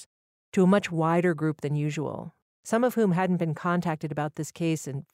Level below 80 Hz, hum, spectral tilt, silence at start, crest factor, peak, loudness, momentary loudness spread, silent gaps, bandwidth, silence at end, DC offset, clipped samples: -68 dBFS; none; -7 dB/octave; 0 s; 16 dB; -10 dBFS; -27 LUFS; 10 LU; 0.06-0.52 s, 2.42-2.63 s; 15.5 kHz; 0.15 s; under 0.1%; under 0.1%